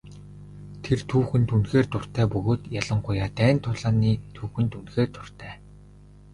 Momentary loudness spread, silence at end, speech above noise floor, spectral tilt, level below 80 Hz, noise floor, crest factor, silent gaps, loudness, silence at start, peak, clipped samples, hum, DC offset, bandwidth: 20 LU; 0.75 s; 25 dB; -7.5 dB/octave; -46 dBFS; -49 dBFS; 20 dB; none; -25 LUFS; 0.05 s; -6 dBFS; under 0.1%; 50 Hz at -35 dBFS; under 0.1%; 11 kHz